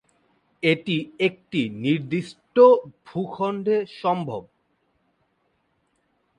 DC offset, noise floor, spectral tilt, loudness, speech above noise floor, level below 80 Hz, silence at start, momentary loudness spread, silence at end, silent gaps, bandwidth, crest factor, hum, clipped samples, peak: under 0.1%; -70 dBFS; -7 dB/octave; -23 LUFS; 48 dB; -68 dBFS; 0.65 s; 15 LU; 1.95 s; none; 9.4 kHz; 20 dB; none; under 0.1%; -4 dBFS